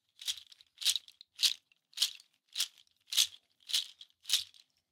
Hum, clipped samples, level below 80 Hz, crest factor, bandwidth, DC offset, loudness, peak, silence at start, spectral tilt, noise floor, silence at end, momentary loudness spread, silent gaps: none; under 0.1%; -88 dBFS; 28 dB; 18 kHz; under 0.1%; -33 LUFS; -10 dBFS; 0.2 s; 5 dB/octave; -54 dBFS; 0.45 s; 19 LU; none